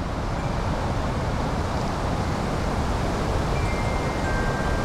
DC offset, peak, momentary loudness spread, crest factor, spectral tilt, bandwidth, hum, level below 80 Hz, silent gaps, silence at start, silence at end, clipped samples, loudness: under 0.1%; -12 dBFS; 2 LU; 12 dB; -6 dB/octave; 15 kHz; none; -30 dBFS; none; 0 s; 0 s; under 0.1%; -26 LUFS